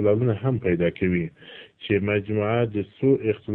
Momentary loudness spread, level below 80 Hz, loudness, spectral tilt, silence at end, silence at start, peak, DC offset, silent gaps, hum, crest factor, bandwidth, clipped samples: 12 LU; -52 dBFS; -24 LUFS; -11 dB/octave; 0 s; 0 s; -8 dBFS; under 0.1%; none; none; 16 dB; 4.1 kHz; under 0.1%